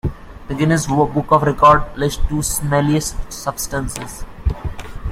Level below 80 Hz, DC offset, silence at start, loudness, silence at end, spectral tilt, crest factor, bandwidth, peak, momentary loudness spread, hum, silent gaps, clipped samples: -28 dBFS; under 0.1%; 0.05 s; -17 LUFS; 0 s; -5 dB/octave; 16 dB; 16.5 kHz; 0 dBFS; 17 LU; none; none; under 0.1%